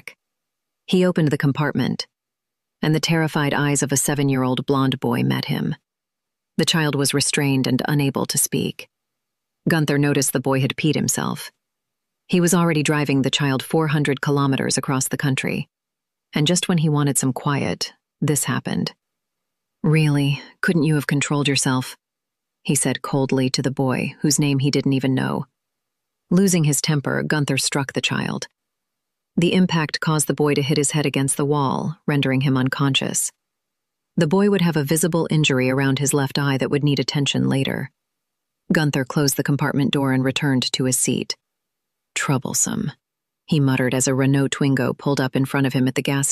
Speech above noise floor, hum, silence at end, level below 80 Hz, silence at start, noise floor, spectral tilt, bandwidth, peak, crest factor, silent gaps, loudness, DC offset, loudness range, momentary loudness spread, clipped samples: 65 dB; none; 0 s; -58 dBFS; 0.05 s; -85 dBFS; -4.5 dB/octave; 15 kHz; -6 dBFS; 14 dB; none; -20 LUFS; under 0.1%; 2 LU; 7 LU; under 0.1%